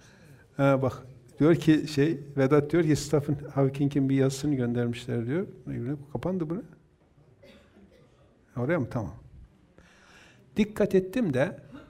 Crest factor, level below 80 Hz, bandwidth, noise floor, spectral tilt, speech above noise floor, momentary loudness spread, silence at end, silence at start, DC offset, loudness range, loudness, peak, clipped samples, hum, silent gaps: 18 dB; -56 dBFS; 15 kHz; -60 dBFS; -7 dB/octave; 34 dB; 12 LU; 0.05 s; 0.6 s; under 0.1%; 11 LU; -27 LUFS; -8 dBFS; under 0.1%; none; none